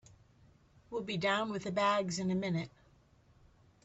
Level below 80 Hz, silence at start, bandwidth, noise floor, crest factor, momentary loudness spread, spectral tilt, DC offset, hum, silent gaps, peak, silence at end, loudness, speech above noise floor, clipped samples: -68 dBFS; 0.9 s; 8.2 kHz; -65 dBFS; 18 dB; 11 LU; -5 dB/octave; under 0.1%; none; none; -18 dBFS; 1.15 s; -34 LUFS; 32 dB; under 0.1%